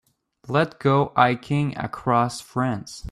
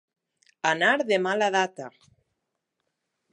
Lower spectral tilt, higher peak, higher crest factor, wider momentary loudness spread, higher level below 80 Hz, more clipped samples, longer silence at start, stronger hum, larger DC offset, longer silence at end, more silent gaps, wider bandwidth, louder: first, -6.5 dB/octave vs -3.5 dB/octave; about the same, -4 dBFS vs -6 dBFS; about the same, 20 dB vs 22 dB; second, 7 LU vs 15 LU; first, -54 dBFS vs -82 dBFS; neither; second, 0.5 s vs 0.65 s; neither; neither; second, 0 s vs 1.45 s; neither; first, 13 kHz vs 10.5 kHz; about the same, -23 LUFS vs -24 LUFS